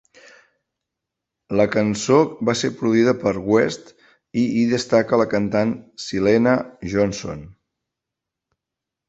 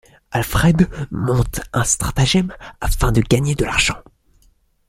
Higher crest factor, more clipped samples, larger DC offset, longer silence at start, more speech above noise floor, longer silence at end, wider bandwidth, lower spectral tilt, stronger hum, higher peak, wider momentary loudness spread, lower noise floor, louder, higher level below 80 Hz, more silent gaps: about the same, 18 dB vs 16 dB; neither; neither; first, 1.5 s vs 0.3 s; first, 66 dB vs 39 dB; first, 1.6 s vs 0.9 s; second, 8.2 kHz vs 16.5 kHz; about the same, -5.5 dB/octave vs -4.5 dB/octave; neither; about the same, -2 dBFS vs -2 dBFS; about the same, 11 LU vs 9 LU; first, -85 dBFS vs -57 dBFS; about the same, -20 LUFS vs -18 LUFS; second, -52 dBFS vs -28 dBFS; neither